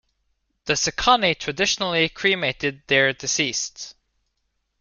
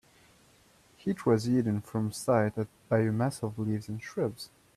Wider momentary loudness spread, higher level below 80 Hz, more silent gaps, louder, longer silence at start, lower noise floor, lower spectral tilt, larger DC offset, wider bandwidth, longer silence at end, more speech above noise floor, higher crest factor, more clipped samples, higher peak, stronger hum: about the same, 11 LU vs 9 LU; first, -50 dBFS vs -66 dBFS; neither; first, -21 LUFS vs -30 LUFS; second, 0.65 s vs 1.05 s; first, -74 dBFS vs -62 dBFS; second, -2 dB/octave vs -7 dB/octave; neither; second, 10.5 kHz vs 14 kHz; first, 0.9 s vs 0.3 s; first, 52 dB vs 32 dB; about the same, 22 dB vs 20 dB; neither; first, -2 dBFS vs -12 dBFS; neither